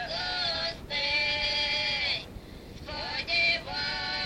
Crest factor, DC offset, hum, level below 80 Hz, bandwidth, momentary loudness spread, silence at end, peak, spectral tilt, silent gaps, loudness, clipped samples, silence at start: 16 dB; under 0.1%; none; -50 dBFS; 16.5 kHz; 15 LU; 0 s; -16 dBFS; -2.5 dB/octave; none; -27 LUFS; under 0.1%; 0 s